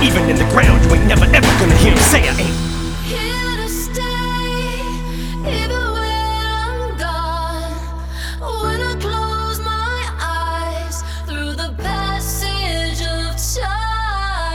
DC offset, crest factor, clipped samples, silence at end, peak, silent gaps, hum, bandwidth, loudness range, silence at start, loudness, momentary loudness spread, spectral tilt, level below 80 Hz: under 0.1%; 16 dB; under 0.1%; 0 s; 0 dBFS; none; none; 19.5 kHz; 9 LU; 0 s; -17 LUFS; 13 LU; -4.5 dB/octave; -20 dBFS